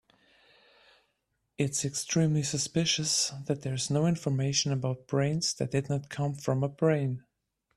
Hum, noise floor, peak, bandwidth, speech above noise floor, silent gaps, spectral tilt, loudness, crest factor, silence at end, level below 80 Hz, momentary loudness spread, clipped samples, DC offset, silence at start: none; -79 dBFS; -12 dBFS; 13.5 kHz; 50 dB; none; -4.5 dB/octave; -29 LUFS; 18 dB; 0.55 s; -64 dBFS; 6 LU; under 0.1%; under 0.1%; 1.6 s